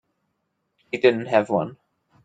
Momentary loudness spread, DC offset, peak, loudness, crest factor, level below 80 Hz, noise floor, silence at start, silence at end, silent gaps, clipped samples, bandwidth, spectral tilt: 14 LU; under 0.1%; -4 dBFS; -21 LUFS; 22 dB; -68 dBFS; -75 dBFS; 0.95 s; 0.5 s; none; under 0.1%; 7.8 kHz; -6.5 dB/octave